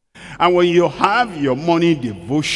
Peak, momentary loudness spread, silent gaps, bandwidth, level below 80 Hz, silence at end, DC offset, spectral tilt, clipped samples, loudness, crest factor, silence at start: 0 dBFS; 7 LU; none; 11.5 kHz; -50 dBFS; 0 s; under 0.1%; -5.5 dB/octave; under 0.1%; -16 LUFS; 16 dB; 0.15 s